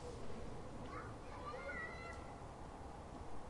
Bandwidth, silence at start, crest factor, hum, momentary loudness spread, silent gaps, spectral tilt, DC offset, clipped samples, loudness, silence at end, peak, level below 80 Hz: 11.5 kHz; 0 s; 14 dB; none; 7 LU; none; -5.5 dB/octave; under 0.1%; under 0.1%; -50 LUFS; 0 s; -34 dBFS; -58 dBFS